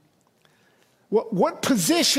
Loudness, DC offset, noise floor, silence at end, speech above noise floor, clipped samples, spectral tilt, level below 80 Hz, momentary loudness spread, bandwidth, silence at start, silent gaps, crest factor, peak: -22 LUFS; under 0.1%; -62 dBFS; 0 s; 41 dB; under 0.1%; -3 dB/octave; -68 dBFS; 6 LU; 16 kHz; 1.1 s; none; 16 dB; -8 dBFS